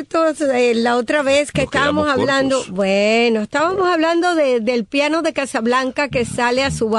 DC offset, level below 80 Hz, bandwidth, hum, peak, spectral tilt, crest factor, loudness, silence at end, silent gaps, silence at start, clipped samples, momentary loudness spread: under 0.1%; -46 dBFS; 11.5 kHz; none; -4 dBFS; -4.5 dB/octave; 12 dB; -17 LUFS; 0 s; none; 0 s; under 0.1%; 3 LU